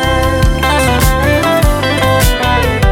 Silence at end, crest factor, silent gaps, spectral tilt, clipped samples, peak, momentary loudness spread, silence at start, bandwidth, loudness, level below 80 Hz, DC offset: 0 s; 10 dB; none; -5 dB/octave; under 0.1%; 0 dBFS; 2 LU; 0 s; over 20 kHz; -11 LUFS; -16 dBFS; under 0.1%